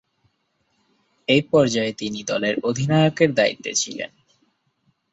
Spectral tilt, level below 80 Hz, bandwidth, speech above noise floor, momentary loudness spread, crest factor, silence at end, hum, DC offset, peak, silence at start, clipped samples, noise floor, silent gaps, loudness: -4.5 dB/octave; -60 dBFS; 8.2 kHz; 49 dB; 11 LU; 20 dB; 1.05 s; none; under 0.1%; -2 dBFS; 1.3 s; under 0.1%; -70 dBFS; none; -20 LUFS